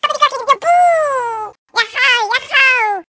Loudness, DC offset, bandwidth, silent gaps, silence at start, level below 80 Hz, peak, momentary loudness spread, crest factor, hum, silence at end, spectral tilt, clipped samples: -13 LUFS; under 0.1%; 8 kHz; 1.58-1.66 s; 0.05 s; -64 dBFS; 0 dBFS; 10 LU; 14 dB; none; 0.05 s; 0.5 dB/octave; under 0.1%